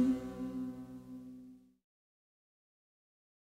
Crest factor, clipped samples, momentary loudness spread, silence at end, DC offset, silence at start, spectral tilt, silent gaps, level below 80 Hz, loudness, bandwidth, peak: 20 dB; under 0.1%; 19 LU; 1.9 s; under 0.1%; 0 s; -7.5 dB/octave; none; -66 dBFS; -41 LUFS; 10 kHz; -20 dBFS